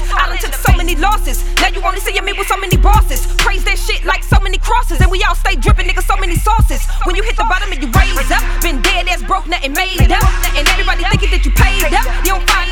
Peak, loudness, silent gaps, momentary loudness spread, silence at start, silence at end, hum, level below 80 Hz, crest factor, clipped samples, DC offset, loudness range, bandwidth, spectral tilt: 0 dBFS; -14 LUFS; none; 4 LU; 0 s; 0 s; none; -14 dBFS; 12 dB; under 0.1%; under 0.1%; 1 LU; 18 kHz; -4 dB/octave